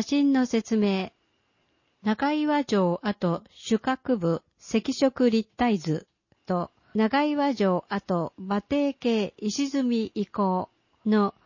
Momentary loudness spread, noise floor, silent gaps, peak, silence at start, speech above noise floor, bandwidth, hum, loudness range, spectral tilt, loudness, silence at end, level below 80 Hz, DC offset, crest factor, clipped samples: 7 LU; -70 dBFS; none; -10 dBFS; 0 s; 45 dB; 7.4 kHz; none; 2 LU; -6 dB/octave; -26 LUFS; 0.15 s; -62 dBFS; under 0.1%; 16 dB; under 0.1%